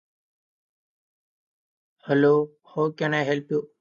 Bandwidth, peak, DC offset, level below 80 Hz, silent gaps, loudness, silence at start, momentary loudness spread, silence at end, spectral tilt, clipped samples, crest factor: 7.2 kHz; -8 dBFS; under 0.1%; -76 dBFS; none; -24 LUFS; 2.05 s; 9 LU; 0.15 s; -7 dB/octave; under 0.1%; 18 dB